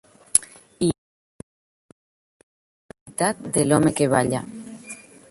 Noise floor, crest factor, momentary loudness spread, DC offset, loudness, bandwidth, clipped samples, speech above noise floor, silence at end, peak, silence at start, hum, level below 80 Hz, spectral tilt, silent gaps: -42 dBFS; 26 dB; 20 LU; under 0.1%; -21 LUFS; 16 kHz; under 0.1%; 22 dB; 0.35 s; 0 dBFS; 0.35 s; none; -56 dBFS; -4.5 dB/octave; 0.98-2.89 s, 3.01-3.06 s